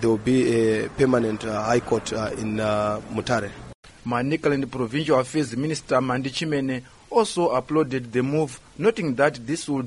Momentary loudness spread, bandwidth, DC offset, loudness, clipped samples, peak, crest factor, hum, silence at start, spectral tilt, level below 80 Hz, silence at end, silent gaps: 7 LU; 11.5 kHz; under 0.1%; -24 LUFS; under 0.1%; -4 dBFS; 18 dB; none; 0 s; -5.5 dB/octave; -52 dBFS; 0 s; 3.75-3.83 s